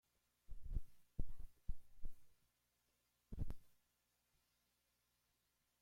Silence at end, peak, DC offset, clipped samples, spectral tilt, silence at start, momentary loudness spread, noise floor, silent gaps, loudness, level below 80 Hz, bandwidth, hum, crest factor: 2.15 s; -28 dBFS; under 0.1%; under 0.1%; -7.5 dB/octave; 0.5 s; 11 LU; -85 dBFS; none; -56 LUFS; -52 dBFS; 2.6 kHz; 60 Hz at -75 dBFS; 18 dB